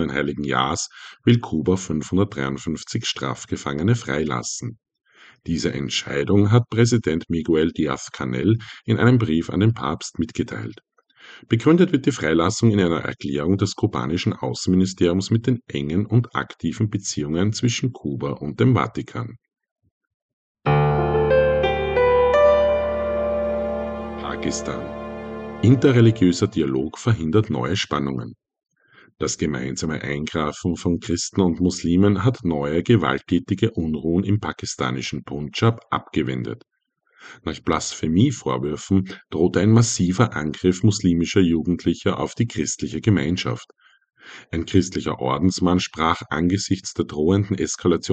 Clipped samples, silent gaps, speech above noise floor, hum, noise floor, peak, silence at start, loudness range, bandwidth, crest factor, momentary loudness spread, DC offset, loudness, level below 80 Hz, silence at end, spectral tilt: under 0.1%; 19.71-19.76 s, 19.91-20.01 s, 20.14-20.55 s; 40 dB; none; -61 dBFS; -4 dBFS; 0 s; 5 LU; 9 kHz; 18 dB; 11 LU; under 0.1%; -21 LUFS; -44 dBFS; 0 s; -6 dB/octave